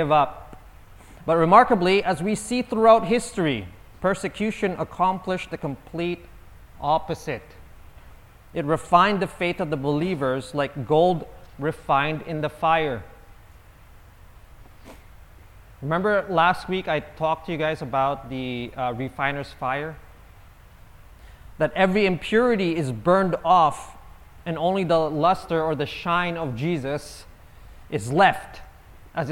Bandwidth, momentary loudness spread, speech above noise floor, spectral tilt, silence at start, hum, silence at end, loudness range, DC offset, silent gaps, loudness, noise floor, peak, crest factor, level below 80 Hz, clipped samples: 17.5 kHz; 14 LU; 26 dB; -6 dB/octave; 0 s; none; 0 s; 9 LU; under 0.1%; none; -23 LUFS; -48 dBFS; 0 dBFS; 24 dB; -48 dBFS; under 0.1%